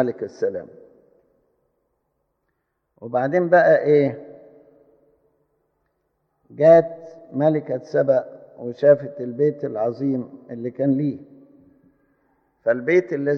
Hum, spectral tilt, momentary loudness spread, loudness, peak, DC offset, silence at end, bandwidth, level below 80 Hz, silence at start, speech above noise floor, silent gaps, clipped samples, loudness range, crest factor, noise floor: none; -9 dB/octave; 19 LU; -20 LUFS; -2 dBFS; under 0.1%; 0 s; 6.4 kHz; -74 dBFS; 0 s; 55 dB; none; under 0.1%; 7 LU; 20 dB; -74 dBFS